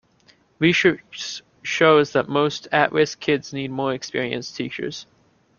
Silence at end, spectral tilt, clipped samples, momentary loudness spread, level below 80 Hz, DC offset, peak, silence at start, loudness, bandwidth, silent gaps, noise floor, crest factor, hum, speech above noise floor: 0.55 s; -4.5 dB/octave; under 0.1%; 14 LU; -62 dBFS; under 0.1%; -2 dBFS; 0.6 s; -21 LUFS; 7.2 kHz; none; -58 dBFS; 20 dB; none; 37 dB